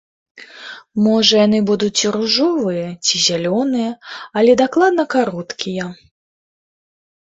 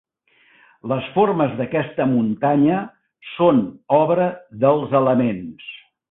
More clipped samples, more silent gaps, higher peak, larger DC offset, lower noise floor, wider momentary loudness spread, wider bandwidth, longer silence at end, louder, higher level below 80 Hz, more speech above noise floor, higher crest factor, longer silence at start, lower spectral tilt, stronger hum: neither; neither; first, 0 dBFS vs -4 dBFS; neither; second, -36 dBFS vs -58 dBFS; second, 14 LU vs 17 LU; first, 8 kHz vs 4 kHz; first, 1.3 s vs 0.35 s; first, -16 LUFS vs -19 LUFS; about the same, -60 dBFS vs -60 dBFS; second, 20 dB vs 40 dB; about the same, 18 dB vs 16 dB; second, 0.35 s vs 0.85 s; second, -3.5 dB/octave vs -12 dB/octave; neither